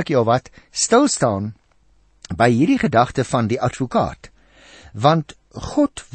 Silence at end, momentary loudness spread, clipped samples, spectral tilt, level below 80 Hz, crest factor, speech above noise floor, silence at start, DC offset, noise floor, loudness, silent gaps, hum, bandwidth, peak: 0.1 s; 15 LU; under 0.1%; -5 dB/octave; -46 dBFS; 18 dB; 39 dB; 0 s; under 0.1%; -58 dBFS; -18 LUFS; none; none; 8.8 kHz; -2 dBFS